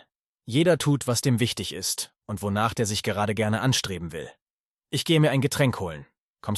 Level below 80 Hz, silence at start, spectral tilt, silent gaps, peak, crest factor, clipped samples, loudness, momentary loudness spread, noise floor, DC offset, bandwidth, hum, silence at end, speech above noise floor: -58 dBFS; 0.45 s; -4.5 dB/octave; 4.42-4.75 s, 6.18-6.35 s; -8 dBFS; 18 dB; under 0.1%; -25 LUFS; 13 LU; under -90 dBFS; under 0.1%; 13 kHz; none; 0 s; over 65 dB